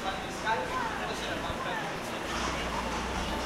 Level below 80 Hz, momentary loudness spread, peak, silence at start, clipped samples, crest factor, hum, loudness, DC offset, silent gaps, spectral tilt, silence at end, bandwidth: -46 dBFS; 3 LU; -18 dBFS; 0 s; under 0.1%; 16 dB; none; -33 LUFS; under 0.1%; none; -3.5 dB/octave; 0 s; 16 kHz